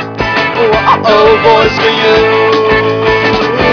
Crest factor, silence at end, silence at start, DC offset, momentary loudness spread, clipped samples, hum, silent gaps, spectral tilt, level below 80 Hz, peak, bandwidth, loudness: 8 dB; 0 s; 0 s; under 0.1%; 4 LU; 0.1%; none; none; -5.5 dB/octave; -32 dBFS; 0 dBFS; 5.4 kHz; -8 LUFS